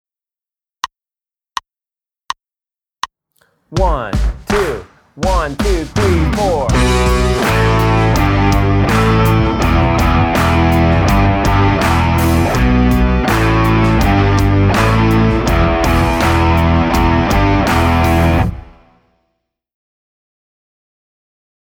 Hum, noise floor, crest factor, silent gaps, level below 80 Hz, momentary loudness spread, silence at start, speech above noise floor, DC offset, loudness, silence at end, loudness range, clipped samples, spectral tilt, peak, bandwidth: none; under -90 dBFS; 14 dB; none; -20 dBFS; 15 LU; 0.85 s; over 77 dB; under 0.1%; -13 LUFS; 3.15 s; 10 LU; under 0.1%; -6.5 dB/octave; 0 dBFS; over 20 kHz